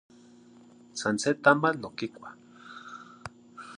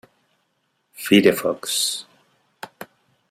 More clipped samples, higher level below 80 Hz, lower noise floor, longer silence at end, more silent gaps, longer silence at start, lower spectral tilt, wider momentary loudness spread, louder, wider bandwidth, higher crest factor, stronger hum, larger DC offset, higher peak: neither; about the same, -68 dBFS vs -64 dBFS; second, -54 dBFS vs -70 dBFS; second, 0 s vs 0.45 s; neither; about the same, 0.95 s vs 1 s; about the same, -4.5 dB/octave vs -3.5 dB/octave; about the same, 25 LU vs 26 LU; second, -27 LUFS vs -19 LUFS; second, 11.5 kHz vs 16 kHz; about the same, 24 dB vs 22 dB; neither; neither; second, -6 dBFS vs -2 dBFS